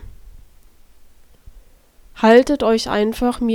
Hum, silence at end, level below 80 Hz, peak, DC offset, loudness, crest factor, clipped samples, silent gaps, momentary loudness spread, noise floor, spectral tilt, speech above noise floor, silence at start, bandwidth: none; 0 s; -40 dBFS; 0 dBFS; under 0.1%; -16 LUFS; 18 dB; under 0.1%; none; 7 LU; -48 dBFS; -5 dB/octave; 33 dB; 0 s; 16.5 kHz